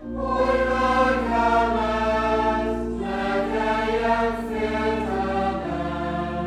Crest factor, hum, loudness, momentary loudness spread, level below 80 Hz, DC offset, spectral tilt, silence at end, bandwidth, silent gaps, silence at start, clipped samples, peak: 14 dB; none; -23 LUFS; 7 LU; -38 dBFS; under 0.1%; -6 dB/octave; 0 s; 12.5 kHz; none; 0 s; under 0.1%; -8 dBFS